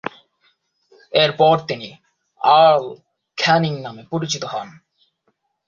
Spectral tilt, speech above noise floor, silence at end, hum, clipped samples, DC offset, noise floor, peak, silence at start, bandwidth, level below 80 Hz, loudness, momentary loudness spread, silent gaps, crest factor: -4.5 dB/octave; 52 dB; 0.95 s; none; under 0.1%; under 0.1%; -69 dBFS; -2 dBFS; 0.05 s; 7.4 kHz; -62 dBFS; -17 LUFS; 20 LU; none; 18 dB